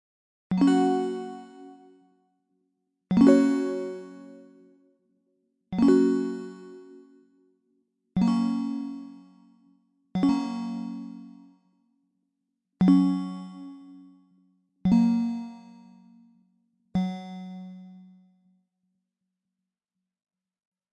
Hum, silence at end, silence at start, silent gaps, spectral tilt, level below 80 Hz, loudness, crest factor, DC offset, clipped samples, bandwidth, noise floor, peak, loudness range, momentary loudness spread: none; 2.95 s; 0.5 s; none; -8 dB/octave; -62 dBFS; -25 LUFS; 20 dB; under 0.1%; under 0.1%; 11 kHz; -87 dBFS; -8 dBFS; 12 LU; 24 LU